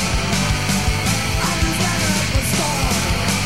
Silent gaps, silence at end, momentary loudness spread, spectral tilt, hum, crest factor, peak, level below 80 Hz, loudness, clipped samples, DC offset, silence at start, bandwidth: none; 0 s; 1 LU; -3.5 dB/octave; none; 14 dB; -6 dBFS; -26 dBFS; -18 LUFS; under 0.1%; 2%; 0 s; 16 kHz